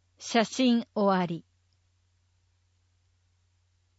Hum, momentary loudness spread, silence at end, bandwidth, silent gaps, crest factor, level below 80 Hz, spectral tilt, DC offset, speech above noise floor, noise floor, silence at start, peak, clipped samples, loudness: 50 Hz at -60 dBFS; 8 LU; 2.6 s; 8 kHz; none; 18 dB; -76 dBFS; -5 dB/octave; under 0.1%; 44 dB; -70 dBFS; 0.2 s; -12 dBFS; under 0.1%; -27 LUFS